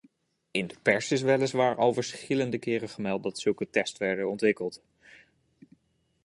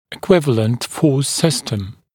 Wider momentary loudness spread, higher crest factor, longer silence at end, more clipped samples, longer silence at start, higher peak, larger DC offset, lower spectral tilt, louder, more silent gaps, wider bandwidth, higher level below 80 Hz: about the same, 8 LU vs 8 LU; about the same, 22 dB vs 18 dB; first, 1.5 s vs 0.25 s; neither; first, 0.55 s vs 0.1 s; second, -8 dBFS vs 0 dBFS; neither; about the same, -5 dB/octave vs -5 dB/octave; second, -28 LUFS vs -17 LUFS; neither; second, 11.5 kHz vs 18 kHz; second, -70 dBFS vs -52 dBFS